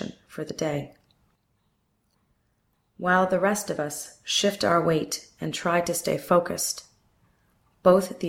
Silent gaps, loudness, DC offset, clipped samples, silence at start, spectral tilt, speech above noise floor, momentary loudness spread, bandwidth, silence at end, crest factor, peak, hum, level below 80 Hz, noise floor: none; -25 LUFS; under 0.1%; under 0.1%; 0 s; -4 dB/octave; 46 dB; 14 LU; 16.5 kHz; 0 s; 20 dB; -6 dBFS; none; -62 dBFS; -71 dBFS